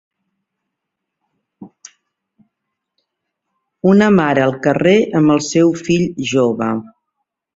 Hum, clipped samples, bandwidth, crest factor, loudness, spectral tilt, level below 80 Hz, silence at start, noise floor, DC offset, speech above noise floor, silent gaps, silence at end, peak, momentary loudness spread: none; under 0.1%; 8 kHz; 16 dB; -14 LUFS; -6 dB/octave; -54 dBFS; 1.6 s; -78 dBFS; under 0.1%; 65 dB; none; 0.7 s; 0 dBFS; 7 LU